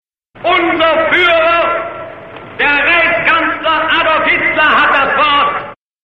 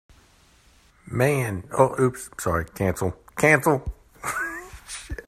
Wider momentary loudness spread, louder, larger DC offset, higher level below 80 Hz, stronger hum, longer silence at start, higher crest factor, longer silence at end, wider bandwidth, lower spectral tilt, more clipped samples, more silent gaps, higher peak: about the same, 14 LU vs 16 LU; first, -10 LUFS vs -24 LUFS; neither; about the same, -42 dBFS vs -44 dBFS; neither; second, 0.35 s vs 1.05 s; second, 12 dB vs 22 dB; first, 0.3 s vs 0.05 s; second, 7.4 kHz vs 15.5 kHz; about the same, -5 dB/octave vs -5.5 dB/octave; neither; neither; about the same, 0 dBFS vs -2 dBFS